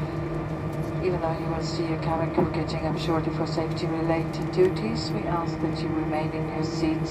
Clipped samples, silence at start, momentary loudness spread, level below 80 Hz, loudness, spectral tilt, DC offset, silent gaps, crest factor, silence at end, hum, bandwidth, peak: under 0.1%; 0 s; 5 LU; -44 dBFS; -27 LUFS; -7 dB/octave; under 0.1%; none; 16 dB; 0 s; none; 12 kHz; -10 dBFS